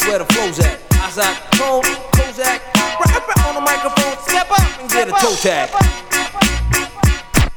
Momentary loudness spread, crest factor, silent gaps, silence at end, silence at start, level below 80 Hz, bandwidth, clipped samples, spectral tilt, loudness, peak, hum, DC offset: 3 LU; 16 dB; none; 0 s; 0 s; -22 dBFS; 19.5 kHz; under 0.1%; -4 dB/octave; -15 LUFS; 0 dBFS; none; under 0.1%